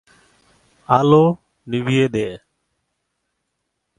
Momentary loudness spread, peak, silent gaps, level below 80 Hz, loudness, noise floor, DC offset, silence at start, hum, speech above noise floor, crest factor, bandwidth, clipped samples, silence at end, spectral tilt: 14 LU; 0 dBFS; none; -56 dBFS; -17 LUFS; -75 dBFS; under 0.1%; 0.9 s; none; 59 dB; 20 dB; 11 kHz; under 0.1%; 1.6 s; -7.5 dB/octave